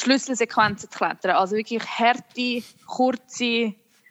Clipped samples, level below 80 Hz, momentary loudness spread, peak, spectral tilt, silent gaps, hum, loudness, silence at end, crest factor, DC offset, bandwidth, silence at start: under 0.1%; -68 dBFS; 6 LU; -4 dBFS; -3 dB/octave; none; none; -23 LUFS; 0.35 s; 18 dB; under 0.1%; 14 kHz; 0 s